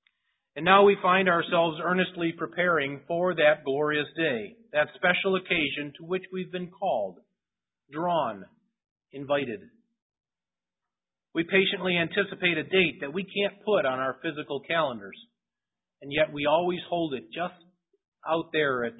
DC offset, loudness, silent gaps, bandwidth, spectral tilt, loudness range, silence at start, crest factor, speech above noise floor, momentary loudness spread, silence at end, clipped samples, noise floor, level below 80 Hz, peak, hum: under 0.1%; -26 LUFS; 8.91-8.96 s, 10.02-10.10 s, 18.08-18.12 s; 4 kHz; -9.5 dB/octave; 9 LU; 0.55 s; 24 dB; over 63 dB; 12 LU; 0.05 s; under 0.1%; under -90 dBFS; -66 dBFS; -4 dBFS; none